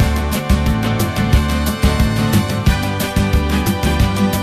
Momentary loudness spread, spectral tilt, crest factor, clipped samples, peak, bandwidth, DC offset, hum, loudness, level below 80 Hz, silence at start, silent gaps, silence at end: 2 LU; -5.5 dB/octave; 14 dB; under 0.1%; -2 dBFS; 14.5 kHz; under 0.1%; none; -16 LUFS; -20 dBFS; 0 s; none; 0 s